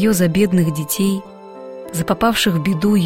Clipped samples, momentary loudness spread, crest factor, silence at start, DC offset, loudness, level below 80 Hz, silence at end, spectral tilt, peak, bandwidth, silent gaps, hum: under 0.1%; 18 LU; 14 dB; 0 s; under 0.1%; -17 LUFS; -44 dBFS; 0 s; -5.5 dB/octave; -4 dBFS; 16.5 kHz; none; none